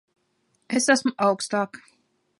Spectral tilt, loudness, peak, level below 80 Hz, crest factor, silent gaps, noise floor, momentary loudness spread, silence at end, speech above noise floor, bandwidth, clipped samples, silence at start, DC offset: -3 dB/octave; -23 LUFS; -6 dBFS; -76 dBFS; 20 dB; none; -70 dBFS; 8 LU; 0.65 s; 47 dB; 11.5 kHz; under 0.1%; 0.7 s; under 0.1%